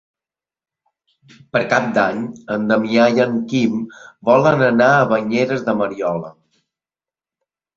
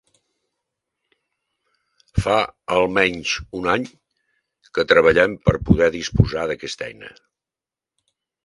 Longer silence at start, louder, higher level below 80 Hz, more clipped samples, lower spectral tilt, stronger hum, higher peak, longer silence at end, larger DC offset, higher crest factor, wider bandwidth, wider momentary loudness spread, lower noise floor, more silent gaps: second, 1.55 s vs 2.15 s; about the same, -17 LUFS vs -19 LUFS; second, -58 dBFS vs -38 dBFS; neither; about the same, -6.5 dB/octave vs -5.5 dB/octave; neither; about the same, 0 dBFS vs 0 dBFS; about the same, 1.45 s vs 1.35 s; neither; about the same, 18 dB vs 22 dB; second, 7.4 kHz vs 11.5 kHz; second, 11 LU vs 14 LU; about the same, under -90 dBFS vs -89 dBFS; neither